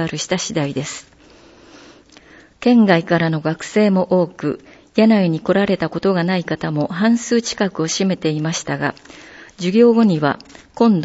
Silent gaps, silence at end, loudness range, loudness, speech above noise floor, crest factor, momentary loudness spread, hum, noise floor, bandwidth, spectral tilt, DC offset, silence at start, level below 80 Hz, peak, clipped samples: none; 0 s; 3 LU; -17 LUFS; 30 dB; 16 dB; 11 LU; none; -46 dBFS; 8 kHz; -5.5 dB/octave; under 0.1%; 0 s; -54 dBFS; 0 dBFS; under 0.1%